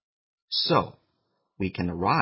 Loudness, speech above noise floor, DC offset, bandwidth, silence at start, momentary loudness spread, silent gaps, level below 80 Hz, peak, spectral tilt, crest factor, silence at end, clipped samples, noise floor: -26 LUFS; 50 dB; under 0.1%; 5.8 kHz; 0.5 s; 10 LU; none; -50 dBFS; -6 dBFS; -9 dB/octave; 22 dB; 0 s; under 0.1%; -75 dBFS